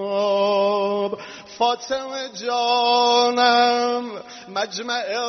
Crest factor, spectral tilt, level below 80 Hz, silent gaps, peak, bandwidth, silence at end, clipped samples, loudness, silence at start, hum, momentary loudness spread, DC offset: 16 dB; -0.5 dB/octave; -70 dBFS; none; -4 dBFS; 6.4 kHz; 0 s; under 0.1%; -20 LUFS; 0 s; none; 13 LU; under 0.1%